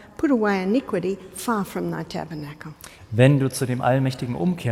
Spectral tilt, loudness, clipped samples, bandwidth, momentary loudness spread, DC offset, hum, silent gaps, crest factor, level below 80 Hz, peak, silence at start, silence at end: -6.5 dB/octave; -23 LUFS; under 0.1%; 16 kHz; 17 LU; under 0.1%; none; none; 20 dB; -54 dBFS; -4 dBFS; 0 s; 0 s